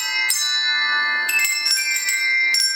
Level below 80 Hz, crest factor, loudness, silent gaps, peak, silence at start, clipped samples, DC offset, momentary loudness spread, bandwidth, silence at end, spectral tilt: -80 dBFS; 20 dB; -17 LUFS; none; 0 dBFS; 0 s; under 0.1%; under 0.1%; 2 LU; over 20 kHz; 0 s; 4.5 dB/octave